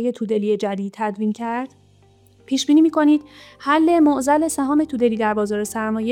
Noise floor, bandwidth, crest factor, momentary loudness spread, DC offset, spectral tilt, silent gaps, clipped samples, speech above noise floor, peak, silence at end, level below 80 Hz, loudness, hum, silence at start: -53 dBFS; 15.5 kHz; 14 dB; 10 LU; under 0.1%; -5 dB/octave; none; under 0.1%; 34 dB; -6 dBFS; 0 s; -56 dBFS; -19 LUFS; none; 0 s